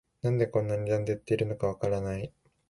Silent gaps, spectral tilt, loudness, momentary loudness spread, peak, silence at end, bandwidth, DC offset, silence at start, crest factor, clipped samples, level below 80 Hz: none; -8 dB/octave; -30 LUFS; 7 LU; -14 dBFS; 0.4 s; 11.5 kHz; under 0.1%; 0.25 s; 16 dB; under 0.1%; -54 dBFS